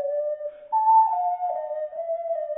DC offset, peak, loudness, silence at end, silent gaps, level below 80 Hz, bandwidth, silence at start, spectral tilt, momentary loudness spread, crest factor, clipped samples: under 0.1%; -10 dBFS; -24 LUFS; 0 s; none; -76 dBFS; 2.8 kHz; 0 s; -5.5 dB/octave; 12 LU; 14 dB; under 0.1%